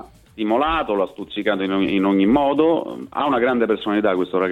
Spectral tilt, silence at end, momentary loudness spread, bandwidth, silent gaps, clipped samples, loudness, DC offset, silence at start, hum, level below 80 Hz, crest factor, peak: -7.5 dB/octave; 0 s; 7 LU; 4.6 kHz; none; under 0.1%; -20 LUFS; under 0.1%; 0 s; none; -48 dBFS; 14 dB; -6 dBFS